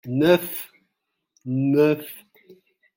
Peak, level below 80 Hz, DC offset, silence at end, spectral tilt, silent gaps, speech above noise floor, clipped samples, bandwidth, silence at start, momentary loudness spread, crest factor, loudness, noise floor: -4 dBFS; -64 dBFS; under 0.1%; 0.75 s; -6.5 dB/octave; none; 58 dB; under 0.1%; 17 kHz; 0.05 s; 21 LU; 20 dB; -21 LUFS; -78 dBFS